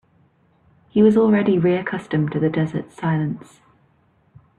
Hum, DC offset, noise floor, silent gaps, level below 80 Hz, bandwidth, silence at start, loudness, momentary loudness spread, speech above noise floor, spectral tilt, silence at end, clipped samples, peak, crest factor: none; under 0.1%; -60 dBFS; none; -58 dBFS; 8.4 kHz; 0.95 s; -19 LUFS; 10 LU; 41 dB; -9 dB/octave; 1.2 s; under 0.1%; -4 dBFS; 16 dB